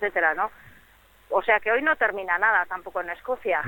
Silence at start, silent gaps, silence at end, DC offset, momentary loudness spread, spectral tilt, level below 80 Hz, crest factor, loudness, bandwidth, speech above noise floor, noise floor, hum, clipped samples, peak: 0 s; none; 0 s; under 0.1%; 10 LU; -5 dB/octave; -60 dBFS; 18 dB; -24 LUFS; 17.5 kHz; 31 dB; -56 dBFS; none; under 0.1%; -8 dBFS